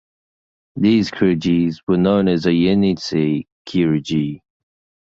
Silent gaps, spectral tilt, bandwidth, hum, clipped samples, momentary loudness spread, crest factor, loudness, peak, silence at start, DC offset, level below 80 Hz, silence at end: 1.83-1.87 s, 3.52-3.65 s; -7.5 dB/octave; 7.8 kHz; none; under 0.1%; 8 LU; 16 dB; -18 LUFS; -2 dBFS; 0.75 s; under 0.1%; -48 dBFS; 0.7 s